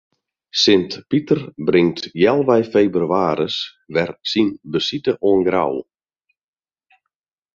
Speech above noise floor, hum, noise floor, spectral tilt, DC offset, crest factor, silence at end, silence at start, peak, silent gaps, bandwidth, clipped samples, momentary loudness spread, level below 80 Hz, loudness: over 72 dB; none; under -90 dBFS; -5.5 dB/octave; under 0.1%; 18 dB; 1.75 s; 0.55 s; -2 dBFS; none; 7.4 kHz; under 0.1%; 8 LU; -56 dBFS; -18 LUFS